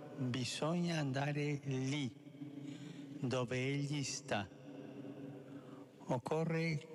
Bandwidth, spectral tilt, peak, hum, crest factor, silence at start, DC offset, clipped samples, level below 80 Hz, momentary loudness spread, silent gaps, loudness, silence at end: 12 kHz; -5.5 dB/octave; -26 dBFS; none; 16 dB; 0 s; under 0.1%; under 0.1%; -78 dBFS; 15 LU; none; -40 LUFS; 0 s